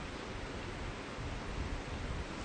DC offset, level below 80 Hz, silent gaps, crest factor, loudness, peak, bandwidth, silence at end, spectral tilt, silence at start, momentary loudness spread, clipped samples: under 0.1%; -46 dBFS; none; 14 dB; -42 LUFS; -28 dBFS; 9.4 kHz; 0 s; -5 dB/octave; 0 s; 2 LU; under 0.1%